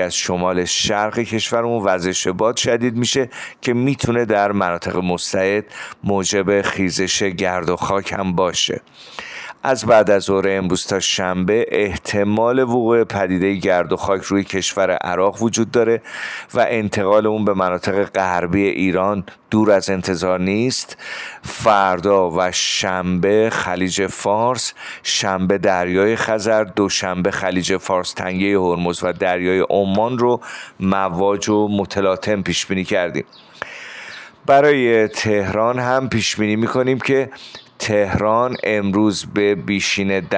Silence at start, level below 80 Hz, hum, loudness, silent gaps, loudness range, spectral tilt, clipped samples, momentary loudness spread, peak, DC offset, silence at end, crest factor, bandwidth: 0 s; -50 dBFS; none; -18 LUFS; none; 2 LU; -4.5 dB/octave; under 0.1%; 8 LU; -4 dBFS; under 0.1%; 0 s; 14 dB; 10 kHz